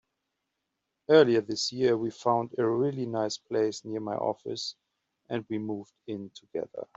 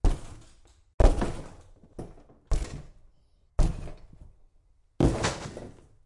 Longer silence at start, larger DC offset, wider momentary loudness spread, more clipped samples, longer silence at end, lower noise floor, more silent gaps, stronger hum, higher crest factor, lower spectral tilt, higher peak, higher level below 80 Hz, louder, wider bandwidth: first, 1.1 s vs 0.05 s; neither; second, 16 LU vs 23 LU; neither; second, 0.15 s vs 0.35 s; first, -83 dBFS vs -62 dBFS; second, none vs 0.94-0.98 s; neither; about the same, 22 dB vs 24 dB; about the same, -5 dB/octave vs -6 dB/octave; about the same, -8 dBFS vs -6 dBFS; second, -74 dBFS vs -32 dBFS; about the same, -29 LUFS vs -30 LUFS; second, 8 kHz vs 11 kHz